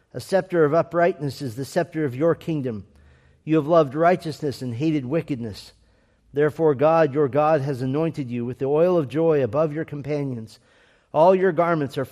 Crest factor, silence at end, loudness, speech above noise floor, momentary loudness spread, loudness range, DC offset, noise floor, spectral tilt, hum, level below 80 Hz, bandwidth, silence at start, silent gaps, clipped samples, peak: 18 dB; 0.05 s; -22 LUFS; 38 dB; 12 LU; 3 LU; under 0.1%; -60 dBFS; -7.5 dB/octave; none; -60 dBFS; 14.5 kHz; 0.15 s; none; under 0.1%; -4 dBFS